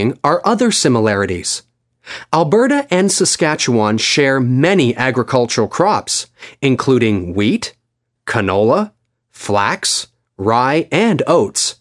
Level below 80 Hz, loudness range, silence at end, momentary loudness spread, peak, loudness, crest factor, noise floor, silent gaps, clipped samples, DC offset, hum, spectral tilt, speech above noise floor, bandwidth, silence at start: -56 dBFS; 4 LU; 0.05 s; 8 LU; 0 dBFS; -15 LUFS; 16 dB; -38 dBFS; none; under 0.1%; under 0.1%; none; -4 dB/octave; 24 dB; 11.5 kHz; 0 s